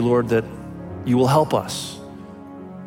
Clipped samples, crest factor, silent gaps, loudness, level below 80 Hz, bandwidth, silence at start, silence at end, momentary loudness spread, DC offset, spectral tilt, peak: under 0.1%; 18 dB; none; -20 LUFS; -52 dBFS; 17 kHz; 0 s; 0 s; 21 LU; under 0.1%; -6 dB/octave; -4 dBFS